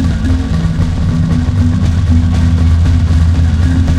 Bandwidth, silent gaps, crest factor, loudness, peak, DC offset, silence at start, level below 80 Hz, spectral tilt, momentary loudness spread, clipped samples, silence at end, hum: 9 kHz; none; 10 dB; -12 LUFS; 0 dBFS; 0.3%; 0 s; -16 dBFS; -7.5 dB/octave; 3 LU; under 0.1%; 0 s; none